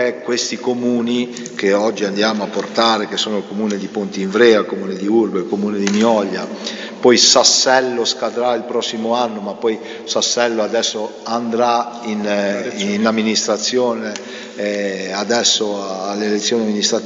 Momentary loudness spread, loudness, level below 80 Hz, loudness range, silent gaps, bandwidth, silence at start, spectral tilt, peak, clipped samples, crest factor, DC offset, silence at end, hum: 10 LU; -17 LUFS; -70 dBFS; 5 LU; none; 8 kHz; 0 s; -3 dB/octave; 0 dBFS; under 0.1%; 18 dB; under 0.1%; 0 s; none